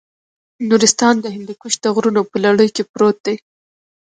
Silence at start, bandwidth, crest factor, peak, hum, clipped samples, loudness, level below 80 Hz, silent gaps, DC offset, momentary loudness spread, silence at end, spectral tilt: 0.6 s; 9.6 kHz; 16 dB; 0 dBFS; none; under 0.1%; -15 LUFS; -64 dBFS; 2.89-2.94 s, 3.20-3.24 s; under 0.1%; 14 LU; 0.7 s; -3.5 dB/octave